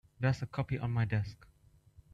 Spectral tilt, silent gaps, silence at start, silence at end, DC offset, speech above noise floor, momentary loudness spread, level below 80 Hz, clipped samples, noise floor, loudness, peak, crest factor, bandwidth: -8 dB/octave; none; 0.2 s; 0.8 s; under 0.1%; 28 dB; 4 LU; -58 dBFS; under 0.1%; -62 dBFS; -35 LUFS; -18 dBFS; 16 dB; 7.8 kHz